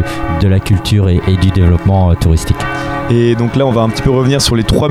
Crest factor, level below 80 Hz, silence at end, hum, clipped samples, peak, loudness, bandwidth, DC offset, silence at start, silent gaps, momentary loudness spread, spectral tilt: 10 dB; -22 dBFS; 0 s; none; under 0.1%; 0 dBFS; -12 LUFS; 14.5 kHz; under 0.1%; 0 s; none; 5 LU; -6 dB/octave